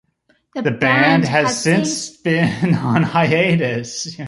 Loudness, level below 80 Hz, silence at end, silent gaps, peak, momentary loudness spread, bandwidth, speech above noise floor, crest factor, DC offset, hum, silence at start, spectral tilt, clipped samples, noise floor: -16 LUFS; -54 dBFS; 0 s; none; -2 dBFS; 9 LU; 11.5 kHz; 45 dB; 16 dB; under 0.1%; none; 0.55 s; -5 dB/octave; under 0.1%; -62 dBFS